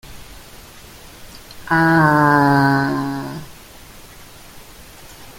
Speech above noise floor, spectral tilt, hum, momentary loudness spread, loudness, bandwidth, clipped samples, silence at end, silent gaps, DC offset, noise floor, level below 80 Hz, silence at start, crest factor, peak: 27 dB; -6.5 dB/octave; none; 26 LU; -15 LUFS; 17 kHz; under 0.1%; 0 s; none; under 0.1%; -40 dBFS; -46 dBFS; 0.05 s; 20 dB; 0 dBFS